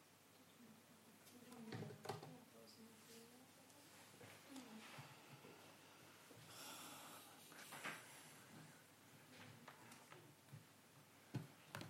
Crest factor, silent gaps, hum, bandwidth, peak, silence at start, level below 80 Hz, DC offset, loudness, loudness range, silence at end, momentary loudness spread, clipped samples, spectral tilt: 28 dB; none; none; 16 kHz; -32 dBFS; 0 s; under -90 dBFS; under 0.1%; -59 LUFS; 4 LU; 0 s; 12 LU; under 0.1%; -4 dB/octave